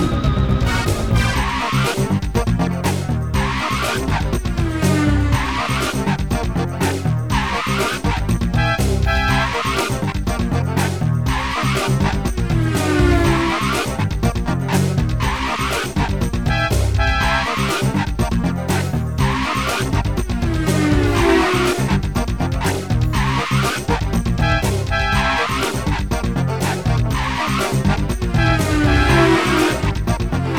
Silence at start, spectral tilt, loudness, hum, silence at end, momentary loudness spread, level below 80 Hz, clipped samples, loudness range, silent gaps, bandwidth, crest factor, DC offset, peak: 0 s; -5.5 dB/octave; -18 LUFS; none; 0 s; 5 LU; -24 dBFS; under 0.1%; 2 LU; none; 19.5 kHz; 16 dB; 0.8%; -2 dBFS